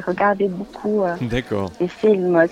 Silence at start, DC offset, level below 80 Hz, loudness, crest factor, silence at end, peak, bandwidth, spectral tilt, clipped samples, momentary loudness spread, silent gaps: 0 s; under 0.1%; -44 dBFS; -20 LUFS; 16 dB; 0 s; -2 dBFS; 10 kHz; -7.5 dB/octave; under 0.1%; 9 LU; none